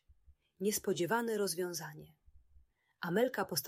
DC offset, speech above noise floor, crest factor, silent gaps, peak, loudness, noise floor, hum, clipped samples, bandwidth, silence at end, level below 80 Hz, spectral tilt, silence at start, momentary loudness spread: under 0.1%; 31 dB; 18 dB; none; -18 dBFS; -36 LUFS; -67 dBFS; none; under 0.1%; 16 kHz; 0 s; -70 dBFS; -4 dB/octave; 0.3 s; 11 LU